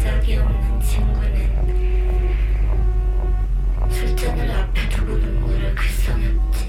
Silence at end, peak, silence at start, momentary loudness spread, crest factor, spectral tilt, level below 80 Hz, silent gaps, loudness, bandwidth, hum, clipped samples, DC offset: 0 s; -8 dBFS; 0 s; 2 LU; 10 dB; -6 dB/octave; -18 dBFS; none; -22 LUFS; 13.5 kHz; none; under 0.1%; under 0.1%